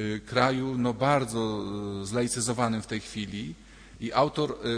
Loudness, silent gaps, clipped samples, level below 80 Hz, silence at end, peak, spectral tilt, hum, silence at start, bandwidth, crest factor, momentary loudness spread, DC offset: -28 LUFS; none; under 0.1%; -54 dBFS; 0 s; -8 dBFS; -5 dB/octave; none; 0 s; 10.5 kHz; 20 dB; 10 LU; under 0.1%